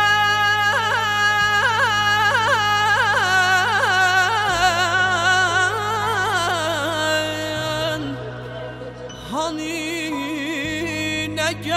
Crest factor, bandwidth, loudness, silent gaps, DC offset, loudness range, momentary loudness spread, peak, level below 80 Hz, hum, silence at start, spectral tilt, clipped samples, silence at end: 14 dB; 16 kHz; -18 LUFS; none; under 0.1%; 9 LU; 10 LU; -6 dBFS; -48 dBFS; none; 0 s; -2.5 dB/octave; under 0.1%; 0 s